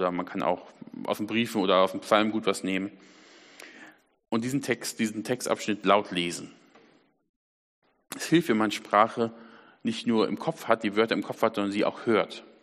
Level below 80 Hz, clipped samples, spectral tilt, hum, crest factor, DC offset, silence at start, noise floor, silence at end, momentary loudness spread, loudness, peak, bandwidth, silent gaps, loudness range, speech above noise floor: -72 dBFS; under 0.1%; -4.5 dB/octave; none; 24 dB; under 0.1%; 0 s; -62 dBFS; 0.2 s; 13 LU; -27 LUFS; -4 dBFS; 14 kHz; 7.29-7.82 s; 4 LU; 35 dB